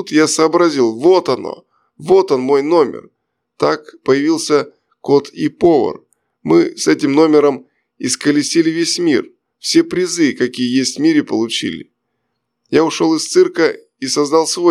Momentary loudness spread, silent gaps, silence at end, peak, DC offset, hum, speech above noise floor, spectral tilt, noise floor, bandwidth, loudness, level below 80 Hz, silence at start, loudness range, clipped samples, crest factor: 12 LU; none; 0 s; 0 dBFS; under 0.1%; none; 58 dB; -4 dB/octave; -72 dBFS; 13 kHz; -14 LUFS; -60 dBFS; 0 s; 2 LU; under 0.1%; 14 dB